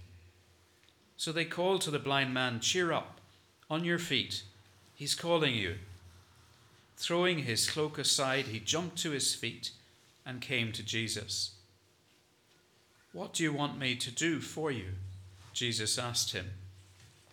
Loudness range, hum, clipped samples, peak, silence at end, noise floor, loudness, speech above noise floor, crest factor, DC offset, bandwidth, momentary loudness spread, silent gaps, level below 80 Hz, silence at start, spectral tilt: 5 LU; none; under 0.1%; -14 dBFS; 0.25 s; -68 dBFS; -33 LUFS; 34 dB; 22 dB; under 0.1%; 19 kHz; 14 LU; none; -74 dBFS; 0 s; -3 dB/octave